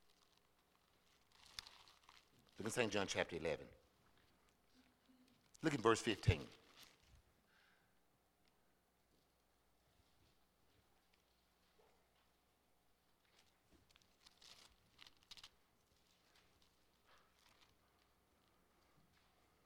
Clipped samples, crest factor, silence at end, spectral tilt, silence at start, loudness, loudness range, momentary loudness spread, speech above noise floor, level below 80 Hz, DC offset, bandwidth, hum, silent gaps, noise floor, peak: under 0.1%; 30 dB; 4.2 s; -4.5 dB/octave; 1.6 s; -41 LUFS; 22 LU; 26 LU; 39 dB; -70 dBFS; under 0.1%; 17.5 kHz; none; none; -79 dBFS; -20 dBFS